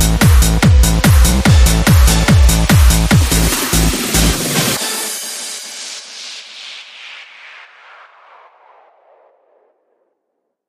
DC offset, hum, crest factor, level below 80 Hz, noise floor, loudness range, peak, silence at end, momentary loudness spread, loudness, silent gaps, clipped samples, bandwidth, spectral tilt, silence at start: under 0.1%; none; 14 dB; -16 dBFS; -72 dBFS; 21 LU; 0 dBFS; 3.2 s; 19 LU; -12 LUFS; none; under 0.1%; 15.5 kHz; -4 dB/octave; 0 s